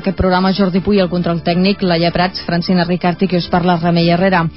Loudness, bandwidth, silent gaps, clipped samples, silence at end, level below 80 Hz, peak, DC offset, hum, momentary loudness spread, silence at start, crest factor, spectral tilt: -14 LUFS; 5.8 kHz; none; under 0.1%; 0 s; -34 dBFS; -2 dBFS; 0.7%; none; 3 LU; 0 s; 12 dB; -11 dB/octave